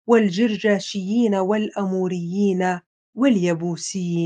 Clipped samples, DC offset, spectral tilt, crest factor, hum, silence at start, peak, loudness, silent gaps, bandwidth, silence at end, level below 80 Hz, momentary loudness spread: under 0.1%; under 0.1%; -6 dB/octave; 18 dB; none; 0.05 s; -2 dBFS; -21 LUFS; 2.86-3.13 s; 9.4 kHz; 0 s; -70 dBFS; 7 LU